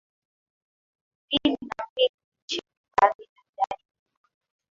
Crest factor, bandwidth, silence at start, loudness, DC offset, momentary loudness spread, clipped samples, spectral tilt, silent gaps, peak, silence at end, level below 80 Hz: 26 dB; 7.6 kHz; 1.3 s; -26 LUFS; under 0.1%; 11 LU; under 0.1%; -3.5 dB/octave; 1.90-1.96 s, 2.09-2.18 s, 2.24-2.32 s, 2.42-2.48 s, 2.77-2.84 s, 3.15-3.19 s, 3.29-3.36 s, 3.49-3.53 s; -4 dBFS; 0.95 s; -62 dBFS